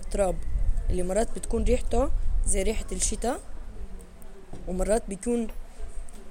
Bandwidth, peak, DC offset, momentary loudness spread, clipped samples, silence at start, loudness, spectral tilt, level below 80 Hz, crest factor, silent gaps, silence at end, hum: 16 kHz; -10 dBFS; under 0.1%; 18 LU; under 0.1%; 0 s; -29 LUFS; -5 dB/octave; -30 dBFS; 16 dB; none; 0 s; none